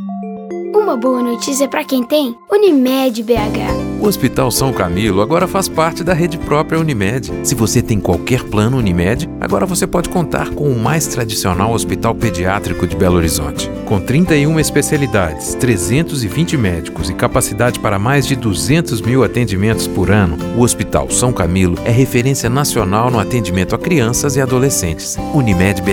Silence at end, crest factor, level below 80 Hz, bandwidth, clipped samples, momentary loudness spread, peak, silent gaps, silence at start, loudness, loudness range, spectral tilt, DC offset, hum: 0 s; 14 dB; -32 dBFS; 19.5 kHz; under 0.1%; 5 LU; 0 dBFS; none; 0 s; -14 LUFS; 2 LU; -5 dB/octave; under 0.1%; none